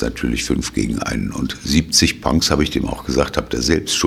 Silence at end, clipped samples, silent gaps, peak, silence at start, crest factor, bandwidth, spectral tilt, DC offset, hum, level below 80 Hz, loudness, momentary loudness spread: 0 s; under 0.1%; none; 0 dBFS; 0 s; 18 dB; 16 kHz; -4 dB/octave; under 0.1%; none; -30 dBFS; -18 LUFS; 8 LU